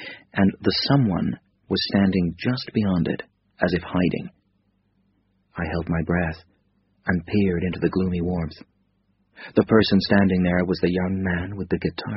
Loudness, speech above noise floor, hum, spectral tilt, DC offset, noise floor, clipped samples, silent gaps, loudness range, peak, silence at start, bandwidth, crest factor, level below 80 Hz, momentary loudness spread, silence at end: -23 LUFS; 45 dB; none; -5.5 dB/octave; under 0.1%; -67 dBFS; under 0.1%; none; 6 LU; -2 dBFS; 0 s; 6 kHz; 22 dB; -46 dBFS; 12 LU; 0 s